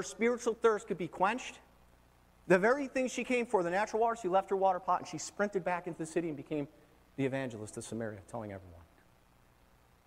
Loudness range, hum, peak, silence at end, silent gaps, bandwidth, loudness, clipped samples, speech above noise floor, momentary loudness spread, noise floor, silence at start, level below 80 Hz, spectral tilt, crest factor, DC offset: 10 LU; 60 Hz at -65 dBFS; -14 dBFS; 1.25 s; none; 15 kHz; -33 LUFS; under 0.1%; 32 dB; 13 LU; -65 dBFS; 0 s; -68 dBFS; -5 dB/octave; 20 dB; under 0.1%